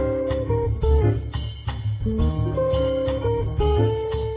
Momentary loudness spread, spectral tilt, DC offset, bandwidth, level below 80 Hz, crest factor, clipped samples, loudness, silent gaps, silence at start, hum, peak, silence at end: 7 LU; -12 dB/octave; under 0.1%; 4 kHz; -28 dBFS; 14 dB; under 0.1%; -23 LUFS; none; 0 s; none; -8 dBFS; 0 s